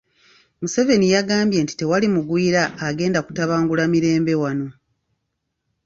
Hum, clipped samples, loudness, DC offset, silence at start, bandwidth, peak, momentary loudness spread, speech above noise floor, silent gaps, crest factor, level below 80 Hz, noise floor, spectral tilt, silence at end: none; under 0.1%; -19 LUFS; under 0.1%; 0.6 s; 7.8 kHz; -4 dBFS; 7 LU; 57 dB; none; 16 dB; -56 dBFS; -76 dBFS; -5.5 dB/octave; 1.15 s